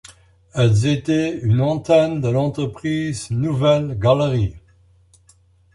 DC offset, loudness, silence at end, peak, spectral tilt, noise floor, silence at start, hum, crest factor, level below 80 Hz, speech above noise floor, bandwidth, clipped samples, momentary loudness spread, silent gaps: under 0.1%; -19 LUFS; 1.15 s; -2 dBFS; -7 dB/octave; -54 dBFS; 0.55 s; none; 16 dB; -44 dBFS; 37 dB; 11.5 kHz; under 0.1%; 7 LU; none